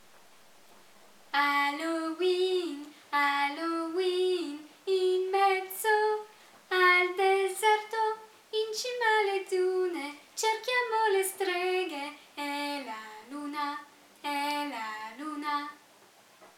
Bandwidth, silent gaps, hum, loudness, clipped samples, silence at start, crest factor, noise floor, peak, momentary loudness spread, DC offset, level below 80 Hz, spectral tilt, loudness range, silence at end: 17.5 kHz; none; none; -29 LUFS; under 0.1%; 1.35 s; 18 dB; -59 dBFS; -12 dBFS; 13 LU; under 0.1%; -90 dBFS; -1 dB/octave; 9 LU; 0.1 s